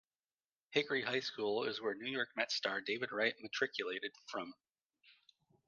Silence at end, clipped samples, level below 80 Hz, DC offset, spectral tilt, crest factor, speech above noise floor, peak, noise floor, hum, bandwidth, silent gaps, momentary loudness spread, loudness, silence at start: 0.55 s; under 0.1%; -86 dBFS; under 0.1%; -3 dB/octave; 24 dB; over 51 dB; -18 dBFS; under -90 dBFS; none; 7.4 kHz; 4.85-4.90 s; 8 LU; -38 LUFS; 0.7 s